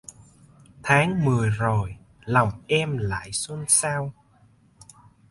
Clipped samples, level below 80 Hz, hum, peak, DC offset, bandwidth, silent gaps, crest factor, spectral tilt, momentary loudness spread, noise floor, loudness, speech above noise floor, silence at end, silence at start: under 0.1%; -50 dBFS; none; -4 dBFS; under 0.1%; 12 kHz; none; 22 dB; -4 dB/octave; 13 LU; -58 dBFS; -23 LUFS; 35 dB; 1.2 s; 0.85 s